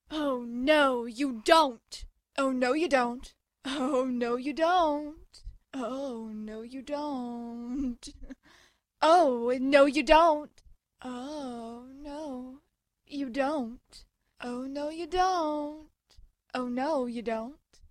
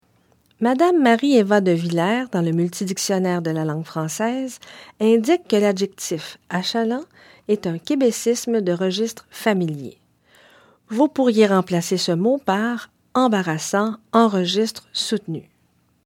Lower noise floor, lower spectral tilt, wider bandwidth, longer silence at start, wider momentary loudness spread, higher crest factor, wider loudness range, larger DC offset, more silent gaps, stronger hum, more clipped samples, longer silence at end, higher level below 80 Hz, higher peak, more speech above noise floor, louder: about the same, -63 dBFS vs -62 dBFS; second, -3.5 dB/octave vs -5 dB/octave; second, 13 kHz vs 16.5 kHz; second, 0.1 s vs 0.6 s; first, 20 LU vs 11 LU; about the same, 24 dB vs 20 dB; first, 12 LU vs 4 LU; neither; neither; neither; neither; second, 0.35 s vs 0.65 s; first, -52 dBFS vs -68 dBFS; second, -6 dBFS vs -2 dBFS; second, 35 dB vs 43 dB; second, -28 LUFS vs -20 LUFS